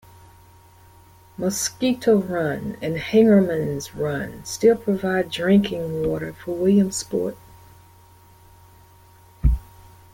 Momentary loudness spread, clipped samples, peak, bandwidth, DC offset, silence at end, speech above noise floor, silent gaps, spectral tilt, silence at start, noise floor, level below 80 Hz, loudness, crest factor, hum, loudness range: 11 LU; under 0.1%; -6 dBFS; 17 kHz; under 0.1%; 0.55 s; 30 dB; none; -5.5 dB/octave; 1.4 s; -50 dBFS; -36 dBFS; -22 LUFS; 18 dB; none; 6 LU